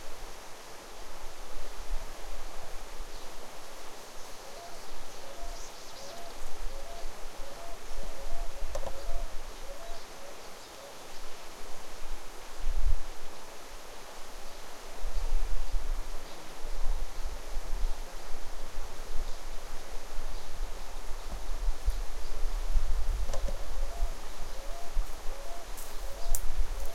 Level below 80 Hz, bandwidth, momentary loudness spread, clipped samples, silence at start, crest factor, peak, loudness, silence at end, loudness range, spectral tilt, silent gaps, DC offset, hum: -34 dBFS; 14.5 kHz; 9 LU; under 0.1%; 0 s; 18 dB; -10 dBFS; -42 LUFS; 0 s; 6 LU; -3.5 dB/octave; none; under 0.1%; none